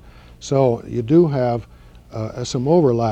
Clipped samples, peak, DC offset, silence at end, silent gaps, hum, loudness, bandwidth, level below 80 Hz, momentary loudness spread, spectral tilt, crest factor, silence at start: under 0.1%; -2 dBFS; under 0.1%; 0 s; none; none; -18 LUFS; 8.6 kHz; -46 dBFS; 14 LU; -7.5 dB/octave; 16 dB; 0.05 s